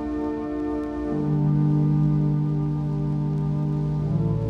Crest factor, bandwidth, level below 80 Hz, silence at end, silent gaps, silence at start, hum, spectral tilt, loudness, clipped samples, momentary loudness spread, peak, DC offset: 12 dB; 3.8 kHz; -42 dBFS; 0 s; none; 0 s; none; -11 dB/octave; -24 LUFS; under 0.1%; 7 LU; -12 dBFS; under 0.1%